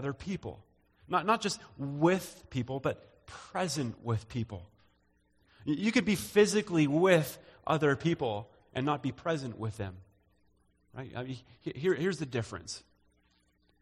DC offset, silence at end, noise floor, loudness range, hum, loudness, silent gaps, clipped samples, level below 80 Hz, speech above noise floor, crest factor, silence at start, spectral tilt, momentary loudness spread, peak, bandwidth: under 0.1%; 1.05 s; -71 dBFS; 9 LU; none; -32 LUFS; none; under 0.1%; -62 dBFS; 39 dB; 20 dB; 0 s; -5.5 dB/octave; 17 LU; -12 dBFS; 15.5 kHz